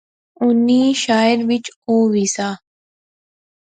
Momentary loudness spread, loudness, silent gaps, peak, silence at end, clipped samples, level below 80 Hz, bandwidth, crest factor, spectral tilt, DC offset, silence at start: 9 LU; -16 LUFS; 1.76-1.82 s; -4 dBFS; 1.05 s; under 0.1%; -64 dBFS; 9.4 kHz; 14 dB; -4 dB/octave; under 0.1%; 0.4 s